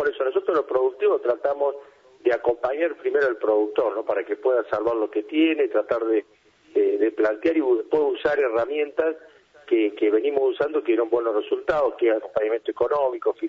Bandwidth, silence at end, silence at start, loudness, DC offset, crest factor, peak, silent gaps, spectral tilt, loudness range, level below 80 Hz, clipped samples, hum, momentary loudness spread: 6 kHz; 0 s; 0 s; -23 LUFS; under 0.1%; 14 dB; -8 dBFS; none; -6.5 dB/octave; 1 LU; -62 dBFS; under 0.1%; none; 4 LU